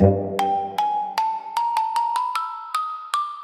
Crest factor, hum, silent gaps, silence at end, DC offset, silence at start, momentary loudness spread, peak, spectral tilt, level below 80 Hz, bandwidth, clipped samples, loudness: 20 dB; none; none; 0 s; under 0.1%; 0 s; 5 LU; -2 dBFS; -6 dB/octave; -54 dBFS; 15.5 kHz; under 0.1%; -24 LUFS